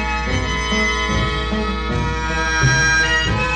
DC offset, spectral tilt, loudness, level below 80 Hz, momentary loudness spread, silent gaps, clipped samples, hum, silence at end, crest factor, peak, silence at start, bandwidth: under 0.1%; -4 dB/octave; -17 LUFS; -26 dBFS; 7 LU; none; under 0.1%; none; 0 s; 14 dB; -4 dBFS; 0 s; 9.6 kHz